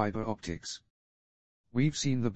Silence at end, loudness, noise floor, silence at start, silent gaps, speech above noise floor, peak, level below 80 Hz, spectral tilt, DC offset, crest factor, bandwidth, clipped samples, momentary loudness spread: 0 s; -33 LUFS; under -90 dBFS; 0 s; 0.90-1.64 s; over 59 dB; -12 dBFS; -58 dBFS; -5.5 dB/octave; under 0.1%; 20 dB; 8.6 kHz; under 0.1%; 12 LU